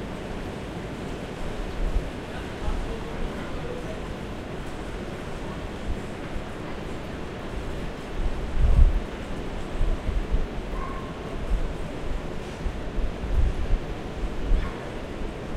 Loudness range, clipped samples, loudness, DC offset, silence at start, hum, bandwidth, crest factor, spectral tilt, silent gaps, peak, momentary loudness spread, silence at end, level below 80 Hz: 6 LU; under 0.1%; -32 LUFS; under 0.1%; 0 s; none; 11 kHz; 24 dB; -6.5 dB/octave; none; -4 dBFS; 7 LU; 0 s; -28 dBFS